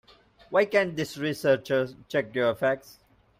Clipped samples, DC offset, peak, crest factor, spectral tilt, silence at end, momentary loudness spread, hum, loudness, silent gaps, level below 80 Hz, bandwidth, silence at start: under 0.1%; under 0.1%; -8 dBFS; 20 dB; -5.5 dB/octave; 0.5 s; 7 LU; none; -27 LUFS; none; -64 dBFS; 16 kHz; 0.5 s